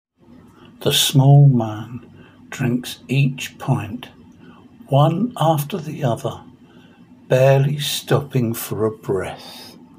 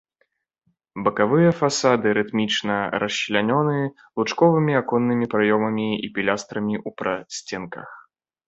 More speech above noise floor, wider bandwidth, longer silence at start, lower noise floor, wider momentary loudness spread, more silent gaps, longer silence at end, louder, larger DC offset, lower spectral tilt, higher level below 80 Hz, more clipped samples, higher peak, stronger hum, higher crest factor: second, 30 dB vs 49 dB; first, 16 kHz vs 8.2 kHz; second, 0.8 s vs 0.95 s; second, -47 dBFS vs -70 dBFS; first, 21 LU vs 12 LU; neither; second, 0.3 s vs 0.5 s; first, -18 LUFS vs -22 LUFS; neither; about the same, -5.5 dB/octave vs -5 dB/octave; about the same, -58 dBFS vs -60 dBFS; neither; about the same, -2 dBFS vs -2 dBFS; neither; about the same, 16 dB vs 20 dB